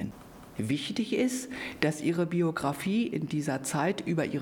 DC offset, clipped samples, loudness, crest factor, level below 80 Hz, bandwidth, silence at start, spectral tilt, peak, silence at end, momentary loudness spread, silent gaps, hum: under 0.1%; under 0.1%; -30 LUFS; 22 dB; -62 dBFS; 19.5 kHz; 0 s; -5.5 dB/octave; -8 dBFS; 0 s; 9 LU; none; none